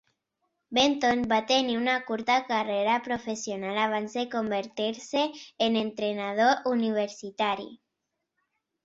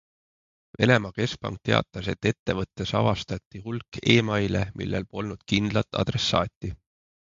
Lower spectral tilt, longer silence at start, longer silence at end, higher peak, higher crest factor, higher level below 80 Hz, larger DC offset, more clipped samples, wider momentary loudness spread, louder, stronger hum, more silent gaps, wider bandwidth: second, -3.5 dB/octave vs -5.5 dB/octave; about the same, 0.7 s vs 0.8 s; first, 1.1 s vs 0.55 s; second, -8 dBFS vs -4 dBFS; about the same, 20 dB vs 22 dB; second, -66 dBFS vs -48 dBFS; neither; neither; second, 8 LU vs 13 LU; about the same, -27 LUFS vs -26 LUFS; neither; second, none vs 2.39-2.46 s, 3.46-3.51 s, 6.56-6.61 s; about the same, 7.8 kHz vs 7.6 kHz